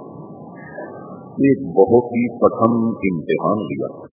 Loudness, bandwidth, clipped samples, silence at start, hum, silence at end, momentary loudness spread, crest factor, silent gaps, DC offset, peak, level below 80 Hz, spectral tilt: -18 LUFS; 3.5 kHz; under 0.1%; 0 s; none; 0.1 s; 21 LU; 18 dB; none; under 0.1%; 0 dBFS; -52 dBFS; -12 dB/octave